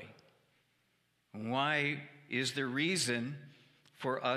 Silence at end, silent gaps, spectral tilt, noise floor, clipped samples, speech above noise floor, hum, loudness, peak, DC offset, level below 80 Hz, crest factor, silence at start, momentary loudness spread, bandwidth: 0 s; none; -3.5 dB/octave; -76 dBFS; under 0.1%; 42 dB; none; -35 LUFS; -18 dBFS; under 0.1%; -80 dBFS; 20 dB; 0 s; 15 LU; 15.5 kHz